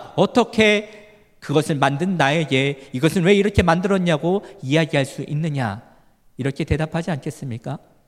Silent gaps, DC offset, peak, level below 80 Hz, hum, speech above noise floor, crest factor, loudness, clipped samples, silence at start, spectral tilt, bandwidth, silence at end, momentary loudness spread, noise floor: none; under 0.1%; 0 dBFS; -44 dBFS; none; 32 dB; 20 dB; -20 LUFS; under 0.1%; 0 s; -6 dB/octave; 14 kHz; 0.3 s; 13 LU; -52 dBFS